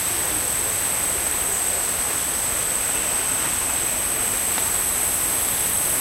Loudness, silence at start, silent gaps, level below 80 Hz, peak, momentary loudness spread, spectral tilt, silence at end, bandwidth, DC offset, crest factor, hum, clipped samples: -19 LUFS; 0 s; none; -44 dBFS; -6 dBFS; 1 LU; -0.5 dB/octave; 0 s; 16 kHz; under 0.1%; 16 dB; none; under 0.1%